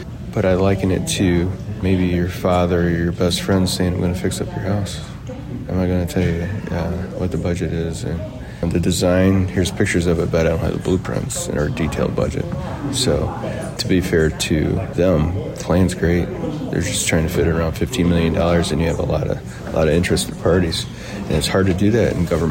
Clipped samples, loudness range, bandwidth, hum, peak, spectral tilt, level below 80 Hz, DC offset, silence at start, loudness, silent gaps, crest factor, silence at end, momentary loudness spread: under 0.1%; 4 LU; 16.5 kHz; none; -6 dBFS; -5.5 dB/octave; -32 dBFS; under 0.1%; 0 s; -19 LUFS; none; 12 dB; 0 s; 8 LU